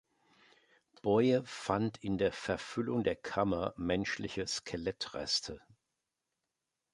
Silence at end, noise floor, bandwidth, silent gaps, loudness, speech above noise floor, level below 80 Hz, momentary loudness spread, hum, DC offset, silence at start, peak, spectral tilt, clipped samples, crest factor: 1.35 s; -88 dBFS; 11.5 kHz; none; -34 LUFS; 54 dB; -60 dBFS; 8 LU; none; under 0.1%; 1.05 s; -14 dBFS; -5 dB/octave; under 0.1%; 22 dB